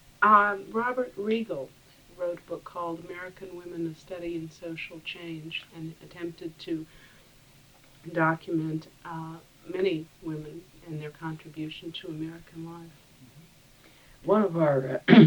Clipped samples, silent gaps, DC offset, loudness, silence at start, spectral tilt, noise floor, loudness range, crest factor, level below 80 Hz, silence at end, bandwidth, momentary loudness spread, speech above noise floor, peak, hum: under 0.1%; none; under 0.1%; -30 LUFS; 0.2 s; -7.5 dB/octave; -56 dBFS; 9 LU; 26 dB; -64 dBFS; 0 s; over 20 kHz; 18 LU; 29 dB; -2 dBFS; none